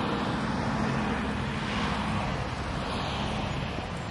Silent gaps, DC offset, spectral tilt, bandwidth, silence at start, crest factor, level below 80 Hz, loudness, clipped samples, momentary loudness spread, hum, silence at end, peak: none; under 0.1%; -5.5 dB/octave; 11.5 kHz; 0 s; 14 dB; -42 dBFS; -30 LUFS; under 0.1%; 4 LU; none; 0 s; -16 dBFS